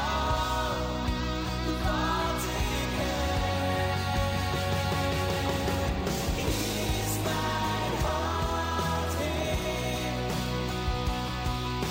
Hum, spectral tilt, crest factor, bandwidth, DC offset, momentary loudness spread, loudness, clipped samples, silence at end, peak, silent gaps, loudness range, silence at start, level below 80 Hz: none; -4.5 dB/octave; 12 dB; 16 kHz; under 0.1%; 3 LU; -29 LUFS; under 0.1%; 0 s; -18 dBFS; none; 1 LU; 0 s; -36 dBFS